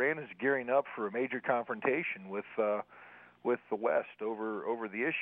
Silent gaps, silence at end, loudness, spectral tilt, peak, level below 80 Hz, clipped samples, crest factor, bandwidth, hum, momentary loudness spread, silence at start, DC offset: none; 0 s; -34 LUFS; -9 dB/octave; -16 dBFS; -86 dBFS; under 0.1%; 18 dB; 3.9 kHz; none; 7 LU; 0 s; under 0.1%